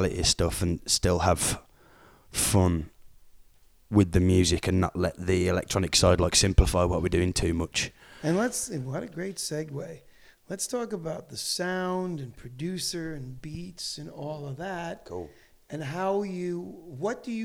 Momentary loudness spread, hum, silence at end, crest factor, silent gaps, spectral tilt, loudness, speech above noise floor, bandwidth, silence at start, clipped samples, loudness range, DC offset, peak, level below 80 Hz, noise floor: 16 LU; none; 0 s; 22 dB; none; -4.5 dB/octave; -27 LUFS; 29 dB; 16.5 kHz; 0 s; under 0.1%; 11 LU; under 0.1%; -6 dBFS; -38 dBFS; -56 dBFS